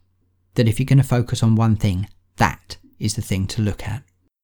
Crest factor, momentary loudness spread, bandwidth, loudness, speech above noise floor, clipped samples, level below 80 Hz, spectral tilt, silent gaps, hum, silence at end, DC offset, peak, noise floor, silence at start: 18 dB; 15 LU; 19.5 kHz; -20 LUFS; 44 dB; under 0.1%; -40 dBFS; -6 dB/octave; none; none; 0.45 s; under 0.1%; -2 dBFS; -63 dBFS; 0.55 s